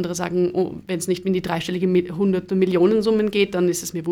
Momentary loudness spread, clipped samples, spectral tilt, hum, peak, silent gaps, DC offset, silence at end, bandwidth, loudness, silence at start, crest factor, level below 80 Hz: 7 LU; under 0.1%; -5.5 dB/octave; none; -6 dBFS; none; under 0.1%; 0 s; 16.5 kHz; -21 LUFS; 0 s; 14 dB; -54 dBFS